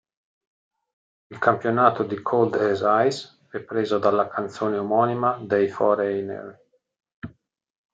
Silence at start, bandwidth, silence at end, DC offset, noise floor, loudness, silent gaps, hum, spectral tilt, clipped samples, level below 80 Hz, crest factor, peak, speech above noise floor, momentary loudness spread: 1.3 s; 8 kHz; 0.65 s; under 0.1%; -60 dBFS; -22 LUFS; 7.14-7.22 s; none; -6.5 dB/octave; under 0.1%; -70 dBFS; 22 dB; -2 dBFS; 38 dB; 17 LU